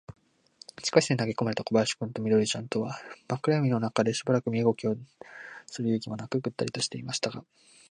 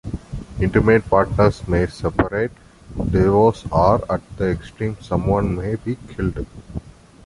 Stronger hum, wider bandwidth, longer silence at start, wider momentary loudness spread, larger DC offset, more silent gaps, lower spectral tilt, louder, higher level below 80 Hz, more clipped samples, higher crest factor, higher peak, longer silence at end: neither; about the same, 10.5 kHz vs 11.5 kHz; about the same, 0.1 s vs 0.05 s; about the same, 16 LU vs 17 LU; neither; neither; second, -5 dB/octave vs -8.5 dB/octave; second, -29 LUFS vs -19 LUFS; second, -68 dBFS vs -32 dBFS; neither; first, 24 dB vs 18 dB; second, -6 dBFS vs -2 dBFS; first, 0.5 s vs 0.35 s